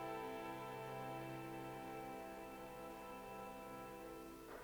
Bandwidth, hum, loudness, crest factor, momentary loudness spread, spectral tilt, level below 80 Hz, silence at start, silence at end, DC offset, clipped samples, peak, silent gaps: over 20 kHz; 50 Hz at -70 dBFS; -51 LUFS; 14 dB; 5 LU; -5.5 dB/octave; -70 dBFS; 0 s; 0 s; under 0.1%; under 0.1%; -36 dBFS; none